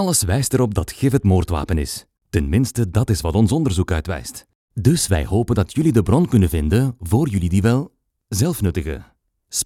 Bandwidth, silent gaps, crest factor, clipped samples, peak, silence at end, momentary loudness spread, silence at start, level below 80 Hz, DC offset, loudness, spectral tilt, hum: 16 kHz; 4.55-4.68 s; 18 dB; under 0.1%; -2 dBFS; 0 s; 11 LU; 0 s; -34 dBFS; under 0.1%; -19 LUFS; -6 dB/octave; none